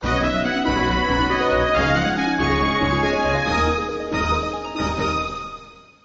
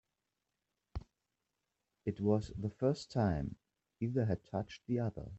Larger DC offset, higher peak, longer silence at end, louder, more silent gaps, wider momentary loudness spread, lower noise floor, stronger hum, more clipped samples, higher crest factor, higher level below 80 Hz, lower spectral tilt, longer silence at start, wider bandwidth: neither; first, -6 dBFS vs -20 dBFS; first, 0.25 s vs 0 s; first, -20 LUFS vs -37 LUFS; neither; second, 7 LU vs 16 LU; second, -42 dBFS vs -88 dBFS; neither; neither; second, 14 dB vs 20 dB; first, -32 dBFS vs -58 dBFS; second, -5.5 dB/octave vs -8 dB/octave; second, 0 s vs 0.95 s; about the same, 8 kHz vs 8.2 kHz